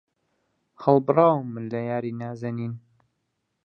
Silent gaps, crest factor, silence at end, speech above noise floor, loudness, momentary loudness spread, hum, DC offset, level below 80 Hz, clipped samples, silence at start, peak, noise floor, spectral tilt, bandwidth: none; 22 dB; 0.9 s; 53 dB; -24 LUFS; 13 LU; none; under 0.1%; -68 dBFS; under 0.1%; 0.8 s; -4 dBFS; -77 dBFS; -10 dB/octave; 6.8 kHz